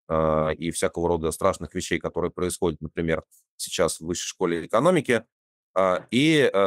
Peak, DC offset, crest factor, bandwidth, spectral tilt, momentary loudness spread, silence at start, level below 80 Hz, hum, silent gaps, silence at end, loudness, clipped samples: -6 dBFS; under 0.1%; 18 dB; 16 kHz; -4.5 dB/octave; 9 LU; 0.1 s; -48 dBFS; none; 3.48-3.58 s, 5.32-5.74 s; 0 s; -25 LUFS; under 0.1%